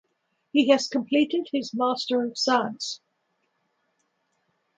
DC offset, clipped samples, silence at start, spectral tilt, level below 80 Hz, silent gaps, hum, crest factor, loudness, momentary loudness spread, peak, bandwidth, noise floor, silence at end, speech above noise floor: under 0.1%; under 0.1%; 0.55 s; -3.5 dB/octave; -78 dBFS; none; none; 22 dB; -24 LUFS; 10 LU; -6 dBFS; 9.2 kHz; -74 dBFS; 1.8 s; 50 dB